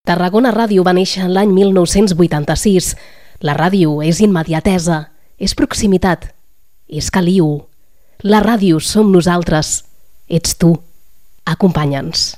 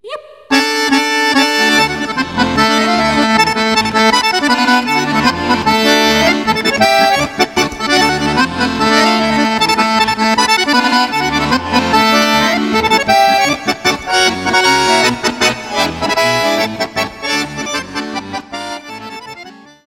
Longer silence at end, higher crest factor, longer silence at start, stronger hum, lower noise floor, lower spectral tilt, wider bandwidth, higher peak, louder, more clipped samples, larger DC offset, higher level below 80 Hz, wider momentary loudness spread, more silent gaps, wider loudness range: second, 0.05 s vs 0.3 s; about the same, 14 dB vs 12 dB; about the same, 0.05 s vs 0.05 s; neither; first, -56 dBFS vs -35 dBFS; first, -5.5 dB/octave vs -3 dB/octave; about the same, 15.5 kHz vs 17 kHz; about the same, 0 dBFS vs 0 dBFS; about the same, -13 LUFS vs -12 LUFS; neither; first, 1% vs 0.2%; first, -34 dBFS vs -40 dBFS; about the same, 10 LU vs 10 LU; neither; about the same, 3 LU vs 4 LU